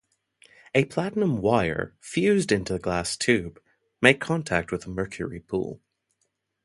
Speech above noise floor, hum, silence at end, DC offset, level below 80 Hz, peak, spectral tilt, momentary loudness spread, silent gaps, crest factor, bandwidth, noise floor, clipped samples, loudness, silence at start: 51 dB; none; 0.9 s; under 0.1%; -50 dBFS; 0 dBFS; -5 dB/octave; 11 LU; none; 26 dB; 11.5 kHz; -76 dBFS; under 0.1%; -25 LUFS; 0.75 s